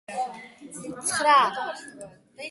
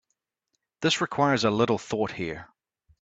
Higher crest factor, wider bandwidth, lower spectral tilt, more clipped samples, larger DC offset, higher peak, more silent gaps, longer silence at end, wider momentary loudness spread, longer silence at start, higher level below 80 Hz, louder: about the same, 18 dB vs 18 dB; first, 12 kHz vs 9 kHz; second, -1.5 dB/octave vs -4.5 dB/octave; neither; neither; about the same, -8 dBFS vs -8 dBFS; neither; second, 0 s vs 0.55 s; first, 24 LU vs 11 LU; second, 0.1 s vs 0.8 s; second, -72 dBFS vs -62 dBFS; about the same, -24 LUFS vs -26 LUFS